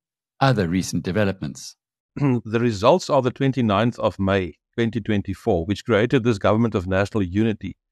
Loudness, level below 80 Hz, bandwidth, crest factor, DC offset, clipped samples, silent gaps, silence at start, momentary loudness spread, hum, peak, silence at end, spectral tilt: -21 LUFS; -50 dBFS; 13 kHz; 20 dB; under 0.1%; under 0.1%; 2.00-2.09 s; 0.4 s; 7 LU; none; -2 dBFS; 0.2 s; -6.5 dB/octave